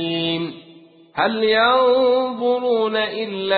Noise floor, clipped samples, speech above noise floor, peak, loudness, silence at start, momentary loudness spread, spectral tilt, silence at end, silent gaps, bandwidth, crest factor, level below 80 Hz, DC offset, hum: -47 dBFS; under 0.1%; 29 dB; -4 dBFS; -18 LUFS; 0 s; 10 LU; -9.5 dB/octave; 0 s; none; 4.8 kHz; 14 dB; -60 dBFS; under 0.1%; none